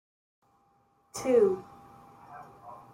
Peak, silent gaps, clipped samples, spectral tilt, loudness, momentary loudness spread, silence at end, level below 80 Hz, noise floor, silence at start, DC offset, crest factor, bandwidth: -12 dBFS; none; under 0.1%; -5 dB/octave; -27 LUFS; 25 LU; 0.15 s; -70 dBFS; -68 dBFS; 1.15 s; under 0.1%; 20 dB; 16.5 kHz